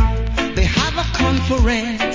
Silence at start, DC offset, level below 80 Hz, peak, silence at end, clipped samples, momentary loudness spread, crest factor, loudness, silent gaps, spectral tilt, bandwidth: 0 s; under 0.1%; -20 dBFS; -2 dBFS; 0 s; under 0.1%; 3 LU; 14 dB; -18 LUFS; none; -5 dB/octave; 7.6 kHz